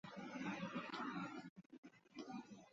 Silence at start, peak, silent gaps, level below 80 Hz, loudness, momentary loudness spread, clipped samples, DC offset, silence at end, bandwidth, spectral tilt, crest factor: 0.05 s; -34 dBFS; 1.50-1.56 s, 1.66-1.70 s, 1.78-1.83 s; -86 dBFS; -50 LUFS; 15 LU; under 0.1%; under 0.1%; 0 s; 7.6 kHz; -4 dB/octave; 18 dB